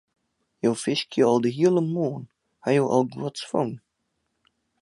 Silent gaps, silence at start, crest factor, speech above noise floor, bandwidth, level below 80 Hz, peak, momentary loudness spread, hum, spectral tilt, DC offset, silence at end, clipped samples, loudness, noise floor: none; 0.65 s; 18 dB; 53 dB; 11.5 kHz; -70 dBFS; -6 dBFS; 11 LU; none; -6 dB/octave; under 0.1%; 1.05 s; under 0.1%; -24 LUFS; -76 dBFS